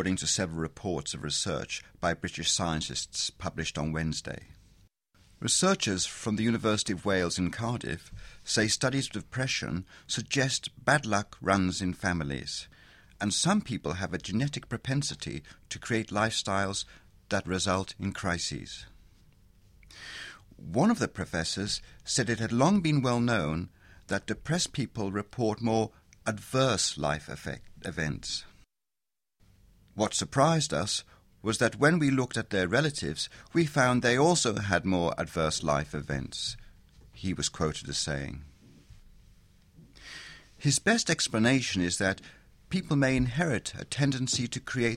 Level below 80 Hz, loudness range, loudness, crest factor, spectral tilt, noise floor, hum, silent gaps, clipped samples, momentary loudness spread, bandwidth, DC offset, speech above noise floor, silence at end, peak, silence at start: -52 dBFS; 6 LU; -29 LUFS; 22 dB; -4 dB/octave; under -90 dBFS; none; none; under 0.1%; 13 LU; 15 kHz; under 0.1%; over 61 dB; 0 s; -8 dBFS; 0 s